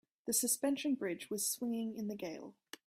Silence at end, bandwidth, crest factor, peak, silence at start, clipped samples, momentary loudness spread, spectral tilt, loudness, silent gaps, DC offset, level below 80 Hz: 0.35 s; 16 kHz; 18 dB; -20 dBFS; 0.25 s; under 0.1%; 13 LU; -2.5 dB/octave; -37 LUFS; none; under 0.1%; -82 dBFS